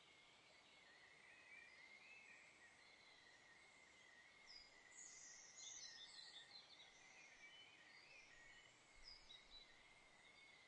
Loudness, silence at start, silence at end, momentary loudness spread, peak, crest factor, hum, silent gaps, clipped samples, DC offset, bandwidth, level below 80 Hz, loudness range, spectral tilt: -63 LUFS; 0 s; 0 s; 9 LU; -46 dBFS; 20 dB; none; none; under 0.1%; under 0.1%; 10 kHz; -84 dBFS; 5 LU; 0.5 dB/octave